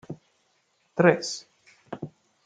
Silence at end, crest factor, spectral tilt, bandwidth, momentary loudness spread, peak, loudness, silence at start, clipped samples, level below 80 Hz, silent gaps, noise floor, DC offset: 0.35 s; 24 dB; -5 dB/octave; 9.4 kHz; 22 LU; -4 dBFS; -24 LUFS; 0.1 s; under 0.1%; -72 dBFS; none; -70 dBFS; under 0.1%